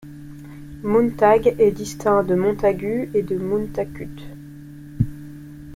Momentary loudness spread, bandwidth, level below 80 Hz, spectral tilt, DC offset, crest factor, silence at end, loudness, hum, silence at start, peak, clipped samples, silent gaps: 23 LU; 16 kHz; -44 dBFS; -7 dB/octave; under 0.1%; 18 dB; 0 s; -20 LUFS; none; 0.05 s; -4 dBFS; under 0.1%; none